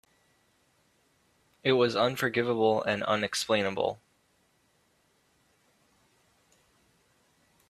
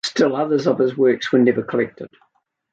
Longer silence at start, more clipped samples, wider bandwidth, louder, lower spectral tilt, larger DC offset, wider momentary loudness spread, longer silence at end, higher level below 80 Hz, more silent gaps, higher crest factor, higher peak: first, 1.65 s vs 0.05 s; neither; first, 15 kHz vs 9 kHz; second, -28 LUFS vs -18 LUFS; about the same, -4.5 dB/octave vs -5.5 dB/octave; neither; second, 7 LU vs 10 LU; first, 3.75 s vs 0.65 s; second, -72 dBFS vs -66 dBFS; neither; first, 22 dB vs 16 dB; second, -10 dBFS vs -2 dBFS